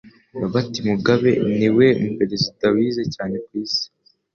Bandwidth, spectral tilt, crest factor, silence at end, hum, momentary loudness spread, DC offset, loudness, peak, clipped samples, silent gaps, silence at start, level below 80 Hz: 7 kHz; -6 dB/octave; 16 dB; 0.5 s; none; 12 LU; under 0.1%; -20 LUFS; -2 dBFS; under 0.1%; none; 0.05 s; -54 dBFS